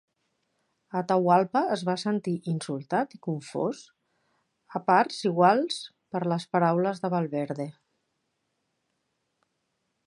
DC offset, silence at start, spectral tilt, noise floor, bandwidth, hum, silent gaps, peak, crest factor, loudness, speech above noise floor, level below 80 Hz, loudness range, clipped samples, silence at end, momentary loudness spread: under 0.1%; 0.95 s; -6 dB/octave; -78 dBFS; 11.5 kHz; none; none; -6 dBFS; 22 dB; -27 LUFS; 52 dB; -80 dBFS; 6 LU; under 0.1%; 2.35 s; 13 LU